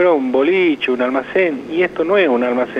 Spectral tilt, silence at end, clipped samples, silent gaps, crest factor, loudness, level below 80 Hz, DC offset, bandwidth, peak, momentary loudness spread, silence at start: -6.5 dB/octave; 0 s; under 0.1%; none; 12 dB; -16 LUFS; -56 dBFS; under 0.1%; 6.8 kHz; -4 dBFS; 4 LU; 0 s